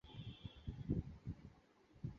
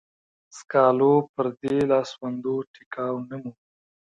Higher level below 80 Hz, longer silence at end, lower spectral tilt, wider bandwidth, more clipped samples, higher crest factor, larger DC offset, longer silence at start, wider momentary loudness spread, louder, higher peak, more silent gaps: first, -56 dBFS vs -66 dBFS; second, 0 s vs 0.6 s; about the same, -8 dB/octave vs -7 dB/octave; second, 7.2 kHz vs 8.8 kHz; neither; about the same, 22 dB vs 20 dB; neither; second, 0.05 s vs 0.55 s; second, 11 LU vs 17 LU; second, -49 LUFS vs -24 LUFS; second, -26 dBFS vs -6 dBFS; second, none vs 1.29-1.34 s, 2.67-2.74 s, 2.86-2.91 s